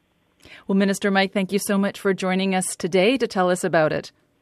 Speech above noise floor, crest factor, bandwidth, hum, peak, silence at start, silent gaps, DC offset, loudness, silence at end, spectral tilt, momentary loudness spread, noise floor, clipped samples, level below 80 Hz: 34 dB; 16 dB; 13.5 kHz; none; -6 dBFS; 0.5 s; none; under 0.1%; -21 LUFS; 0.3 s; -5 dB/octave; 4 LU; -55 dBFS; under 0.1%; -64 dBFS